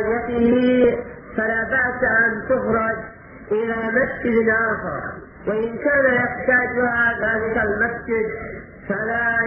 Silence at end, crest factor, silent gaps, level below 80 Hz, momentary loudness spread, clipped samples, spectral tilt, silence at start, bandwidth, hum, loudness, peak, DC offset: 0 s; 16 dB; none; -46 dBFS; 12 LU; under 0.1%; -5 dB/octave; 0 s; 5.2 kHz; none; -20 LUFS; -6 dBFS; under 0.1%